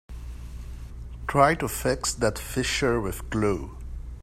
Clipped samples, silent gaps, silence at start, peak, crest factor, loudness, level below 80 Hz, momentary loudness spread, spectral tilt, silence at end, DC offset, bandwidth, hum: under 0.1%; none; 0.1 s; -4 dBFS; 24 dB; -25 LUFS; -38 dBFS; 19 LU; -4.5 dB/octave; 0 s; under 0.1%; 16 kHz; none